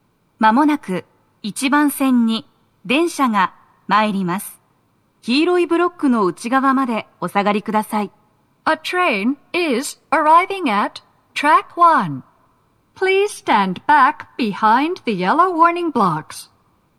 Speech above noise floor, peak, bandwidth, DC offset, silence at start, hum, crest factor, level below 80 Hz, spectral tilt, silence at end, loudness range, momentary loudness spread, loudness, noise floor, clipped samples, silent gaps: 44 dB; -2 dBFS; 13.5 kHz; under 0.1%; 0.4 s; none; 16 dB; -68 dBFS; -4.5 dB/octave; 0.55 s; 3 LU; 12 LU; -17 LUFS; -61 dBFS; under 0.1%; none